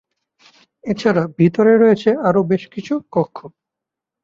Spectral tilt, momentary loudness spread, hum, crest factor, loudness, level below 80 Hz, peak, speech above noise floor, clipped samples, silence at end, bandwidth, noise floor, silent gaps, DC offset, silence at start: -8 dB/octave; 13 LU; none; 16 dB; -16 LUFS; -58 dBFS; -2 dBFS; 69 dB; under 0.1%; 0.75 s; 7.4 kHz; -84 dBFS; none; under 0.1%; 0.85 s